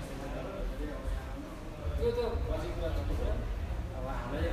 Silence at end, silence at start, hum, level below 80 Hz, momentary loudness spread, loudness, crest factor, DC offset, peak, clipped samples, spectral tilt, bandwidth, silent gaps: 0 s; 0 s; none; -38 dBFS; 8 LU; -37 LUFS; 14 dB; under 0.1%; -20 dBFS; under 0.1%; -7 dB/octave; 15 kHz; none